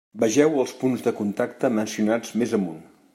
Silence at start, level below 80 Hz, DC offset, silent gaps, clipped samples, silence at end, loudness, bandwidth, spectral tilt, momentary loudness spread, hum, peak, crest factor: 0.15 s; -70 dBFS; under 0.1%; none; under 0.1%; 0.3 s; -23 LUFS; 16 kHz; -5.5 dB/octave; 7 LU; none; -6 dBFS; 18 dB